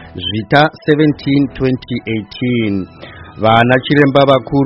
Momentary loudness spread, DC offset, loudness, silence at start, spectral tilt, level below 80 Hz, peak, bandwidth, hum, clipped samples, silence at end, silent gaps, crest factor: 11 LU; under 0.1%; -13 LUFS; 0 s; -8.5 dB/octave; -42 dBFS; 0 dBFS; 6 kHz; none; 0.1%; 0 s; none; 14 dB